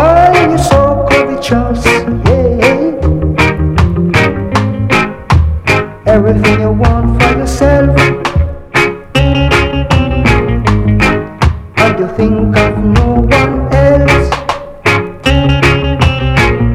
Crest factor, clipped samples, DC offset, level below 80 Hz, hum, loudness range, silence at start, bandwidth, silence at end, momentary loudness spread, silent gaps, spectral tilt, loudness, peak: 10 dB; 0.5%; under 0.1%; -18 dBFS; none; 1 LU; 0 s; 14.5 kHz; 0 s; 4 LU; none; -6.5 dB/octave; -10 LUFS; 0 dBFS